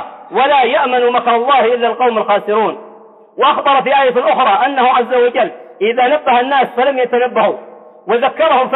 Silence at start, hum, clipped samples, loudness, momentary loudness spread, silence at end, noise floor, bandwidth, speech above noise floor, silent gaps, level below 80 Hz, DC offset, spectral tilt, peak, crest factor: 0 s; none; under 0.1%; -13 LUFS; 7 LU; 0 s; -39 dBFS; 4.1 kHz; 27 dB; none; -62 dBFS; under 0.1%; -7 dB/octave; -2 dBFS; 10 dB